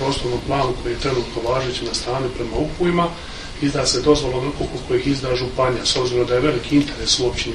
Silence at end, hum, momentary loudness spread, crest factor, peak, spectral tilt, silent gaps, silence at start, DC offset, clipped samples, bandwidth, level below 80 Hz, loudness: 0 s; none; 6 LU; 18 dB; -2 dBFS; -4.5 dB/octave; none; 0 s; under 0.1%; under 0.1%; 11.5 kHz; -34 dBFS; -20 LUFS